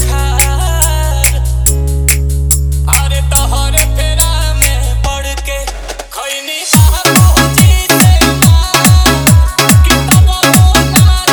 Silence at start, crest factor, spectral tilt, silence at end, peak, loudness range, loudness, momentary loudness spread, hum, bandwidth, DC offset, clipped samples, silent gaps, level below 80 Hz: 0 s; 8 dB; -4 dB/octave; 0 s; 0 dBFS; 5 LU; -9 LUFS; 10 LU; none; over 20 kHz; under 0.1%; 1%; none; -12 dBFS